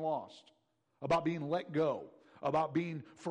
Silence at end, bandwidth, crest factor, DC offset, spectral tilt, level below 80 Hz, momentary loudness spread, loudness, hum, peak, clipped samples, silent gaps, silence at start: 0 s; 10.5 kHz; 14 dB; under 0.1%; -7 dB/octave; -70 dBFS; 12 LU; -36 LUFS; none; -22 dBFS; under 0.1%; none; 0 s